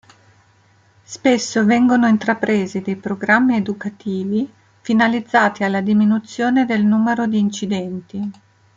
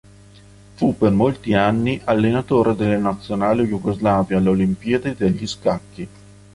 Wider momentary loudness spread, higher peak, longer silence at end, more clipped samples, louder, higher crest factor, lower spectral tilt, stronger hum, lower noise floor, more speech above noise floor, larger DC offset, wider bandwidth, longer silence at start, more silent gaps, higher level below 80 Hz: first, 12 LU vs 6 LU; about the same, 0 dBFS vs -2 dBFS; about the same, 0.45 s vs 0.45 s; neither; about the same, -18 LUFS vs -19 LUFS; about the same, 18 dB vs 16 dB; second, -5.5 dB/octave vs -7.5 dB/octave; second, none vs 50 Hz at -35 dBFS; first, -54 dBFS vs -45 dBFS; first, 37 dB vs 27 dB; neither; second, 7.6 kHz vs 11.5 kHz; first, 1.1 s vs 0.8 s; neither; second, -62 dBFS vs -44 dBFS